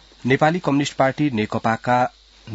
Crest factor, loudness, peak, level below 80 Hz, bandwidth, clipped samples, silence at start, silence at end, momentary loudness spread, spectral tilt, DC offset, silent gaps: 18 dB; -20 LUFS; -2 dBFS; -54 dBFS; 8 kHz; under 0.1%; 0.25 s; 0 s; 4 LU; -6 dB/octave; under 0.1%; none